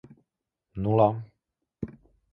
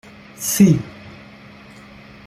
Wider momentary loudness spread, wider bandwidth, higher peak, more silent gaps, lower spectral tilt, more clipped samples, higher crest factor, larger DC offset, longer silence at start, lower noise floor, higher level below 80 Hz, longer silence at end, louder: second, 18 LU vs 26 LU; second, 4.2 kHz vs 15.5 kHz; second, -8 dBFS vs -2 dBFS; neither; first, -11.5 dB/octave vs -5.5 dB/octave; neither; about the same, 22 dB vs 18 dB; neither; first, 0.75 s vs 0.4 s; first, -84 dBFS vs -42 dBFS; about the same, -54 dBFS vs -50 dBFS; second, 0.4 s vs 1.15 s; second, -25 LUFS vs -16 LUFS